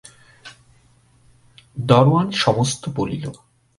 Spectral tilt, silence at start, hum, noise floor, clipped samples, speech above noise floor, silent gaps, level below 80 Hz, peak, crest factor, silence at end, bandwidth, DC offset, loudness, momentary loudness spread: -5.5 dB/octave; 0.45 s; none; -55 dBFS; under 0.1%; 38 dB; none; -52 dBFS; 0 dBFS; 22 dB; 0.45 s; 11.5 kHz; under 0.1%; -19 LUFS; 17 LU